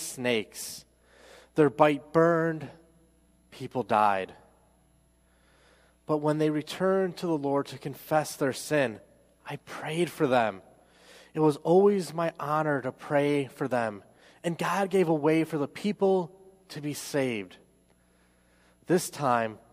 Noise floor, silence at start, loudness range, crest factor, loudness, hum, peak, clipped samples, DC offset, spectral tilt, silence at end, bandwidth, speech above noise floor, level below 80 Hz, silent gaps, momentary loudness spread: -64 dBFS; 0 s; 5 LU; 22 dB; -28 LUFS; none; -8 dBFS; under 0.1%; under 0.1%; -5.5 dB/octave; 0.15 s; 15.5 kHz; 37 dB; -68 dBFS; none; 15 LU